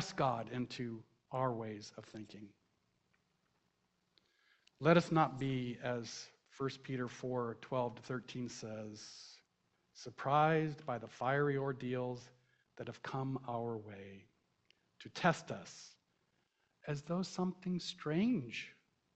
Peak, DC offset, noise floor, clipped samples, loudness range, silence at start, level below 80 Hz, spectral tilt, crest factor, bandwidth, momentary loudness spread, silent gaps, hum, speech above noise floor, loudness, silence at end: -14 dBFS; under 0.1%; -81 dBFS; under 0.1%; 8 LU; 0 s; -72 dBFS; -6 dB/octave; 26 dB; 8.4 kHz; 19 LU; none; none; 43 dB; -38 LUFS; 0.45 s